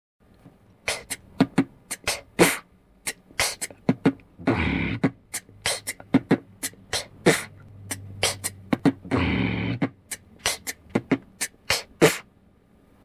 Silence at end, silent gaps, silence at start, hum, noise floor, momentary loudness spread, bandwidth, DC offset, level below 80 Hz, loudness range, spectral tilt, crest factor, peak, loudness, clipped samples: 0.85 s; none; 0.85 s; none; -58 dBFS; 13 LU; 16 kHz; under 0.1%; -46 dBFS; 2 LU; -4 dB/octave; 20 dB; -6 dBFS; -26 LUFS; under 0.1%